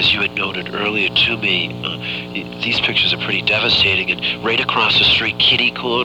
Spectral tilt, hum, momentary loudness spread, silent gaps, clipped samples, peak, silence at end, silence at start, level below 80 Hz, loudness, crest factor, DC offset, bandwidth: -4.5 dB/octave; 60 Hz at -35 dBFS; 10 LU; none; under 0.1%; -4 dBFS; 0 s; 0 s; -46 dBFS; -15 LUFS; 14 dB; 0.1%; 19.5 kHz